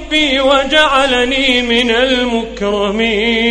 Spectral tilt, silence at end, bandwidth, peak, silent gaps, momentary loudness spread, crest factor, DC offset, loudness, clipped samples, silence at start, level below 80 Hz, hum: -3 dB/octave; 0 s; 11.5 kHz; 0 dBFS; none; 6 LU; 12 dB; under 0.1%; -12 LUFS; under 0.1%; 0 s; -34 dBFS; none